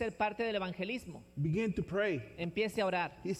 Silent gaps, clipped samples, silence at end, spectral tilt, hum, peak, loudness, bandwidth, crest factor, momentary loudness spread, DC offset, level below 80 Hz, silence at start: none; under 0.1%; 0 s; -6.5 dB/octave; none; -20 dBFS; -35 LUFS; 15 kHz; 16 dB; 6 LU; under 0.1%; -60 dBFS; 0 s